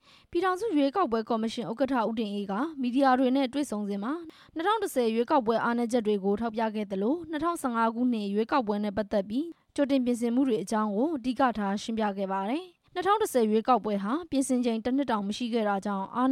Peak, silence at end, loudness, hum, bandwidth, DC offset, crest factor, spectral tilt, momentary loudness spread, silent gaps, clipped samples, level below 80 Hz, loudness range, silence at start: -12 dBFS; 0 s; -28 LUFS; none; 15 kHz; under 0.1%; 16 dB; -5.5 dB/octave; 7 LU; none; under 0.1%; -64 dBFS; 1 LU; 0.3 s